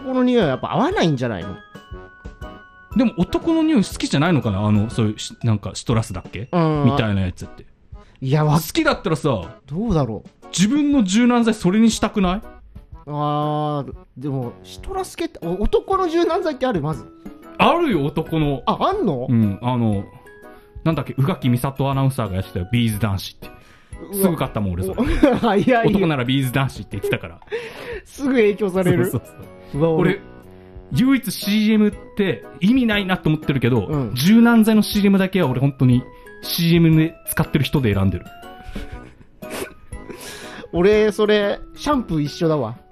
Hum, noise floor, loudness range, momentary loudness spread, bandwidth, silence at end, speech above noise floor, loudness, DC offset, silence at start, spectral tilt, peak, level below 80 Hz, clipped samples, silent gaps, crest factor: none; -43 dBFS; 6 LU; 17 LU; 14.5 kHz; 0.15 s; 24 dB; -19 LUFS; under 0.1%; 0 s; -6.5 dB/octave; 0 dBFS; -38 dBFS; under 0.1%; none; 20 dB